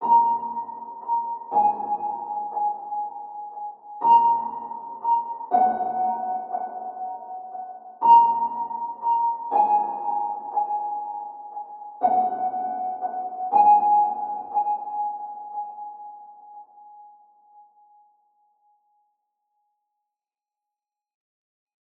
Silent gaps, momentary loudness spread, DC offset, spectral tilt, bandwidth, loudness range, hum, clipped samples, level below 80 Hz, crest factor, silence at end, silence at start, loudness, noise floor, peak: none; 19 LU; under 0.1%; -7.5 dB/octave; 3 kHz; 9 LU; none; under 0.1%; -78 dBFS; 20 dB; 4.35 s; 0 s; -23 LUFS; -90 dBFS; -6 dBFS